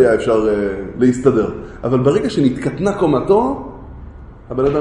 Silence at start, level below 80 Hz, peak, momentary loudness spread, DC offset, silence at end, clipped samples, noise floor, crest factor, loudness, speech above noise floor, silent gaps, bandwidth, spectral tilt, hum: 0 s; -38 dBFS; 0 dBFS; 14 LU; under 0.1%; 0 s; under 0.1%; -35 dBFS; 14 dB; -16 LUFS; 20 dB; none; 10.5 kHz; -7.5 dB/octave; none